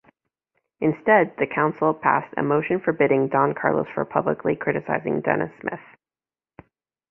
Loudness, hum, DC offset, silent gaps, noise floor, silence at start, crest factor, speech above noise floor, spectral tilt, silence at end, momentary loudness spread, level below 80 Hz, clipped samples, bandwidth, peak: -22 LUFS; none; under 0.1%; none; under -90 dBFS; 0.8 s; 20 dB; over 68 dB; -10.5 dB/octave; 1.3 s; 7 LU; -62 dBFS; under 0.1%; 3.4 kHz; -2 dBFS